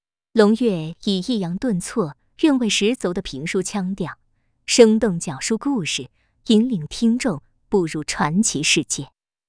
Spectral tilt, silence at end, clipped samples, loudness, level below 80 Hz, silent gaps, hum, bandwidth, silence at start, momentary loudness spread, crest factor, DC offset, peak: -4 dB/octave; 0.45 s; under 0.1%; -20 LUFS; -50 dBFS; none; none; 10.5 kHz; 0.35 s; 10 LU; 20 dB; under 0.1%; 0 dBFS